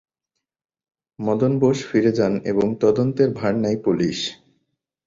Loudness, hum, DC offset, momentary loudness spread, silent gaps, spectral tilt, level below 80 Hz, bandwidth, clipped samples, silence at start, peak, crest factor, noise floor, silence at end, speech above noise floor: -20 LUFS; none; under 0.1%; 6 LU; none; -6.5 dB/octave; -56 dBFS; 7.6 kHz; under 0.1%; 1.2 s; -6 dBFS; 16 dB; -81 dBFS; 0.75 s; 62 dB